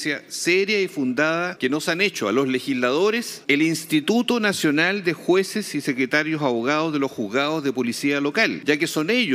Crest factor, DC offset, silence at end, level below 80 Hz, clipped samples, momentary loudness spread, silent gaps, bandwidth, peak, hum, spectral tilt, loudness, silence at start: 18 dB; under 0.1%; 0 s; -74 dBFS; under 0.1%; 4 LU; none; 16 kHz; -4 dBFS; none; -4 dB/octave; -21 LUFS; 0 s